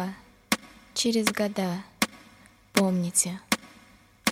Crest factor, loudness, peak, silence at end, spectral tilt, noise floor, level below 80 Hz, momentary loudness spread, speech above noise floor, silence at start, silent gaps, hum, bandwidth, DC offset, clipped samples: 22 dB; -27 LUFS; -6 dBFS; 0 s; -3.5 dB/octave; -56 dBFS; -62 dBFS; 8 LU; 29 dB; 0 s; none; none; 16.5 kHz; under 0.1%; under 0.1%